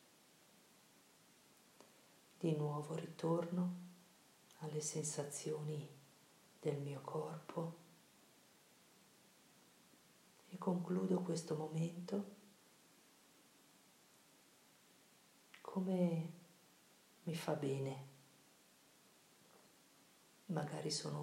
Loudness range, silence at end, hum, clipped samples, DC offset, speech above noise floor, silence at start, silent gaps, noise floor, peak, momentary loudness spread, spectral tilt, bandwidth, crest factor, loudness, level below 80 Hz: 7 LU; 0 s; none; under 0.1%; under 0.1%; 28 dB; 1.8 s; none; -69 dBFS; -26 dBFS; 26 LU; -6 dB/octave; 16 kHz; 20 dB; -43 LUFS; under -90 dBFS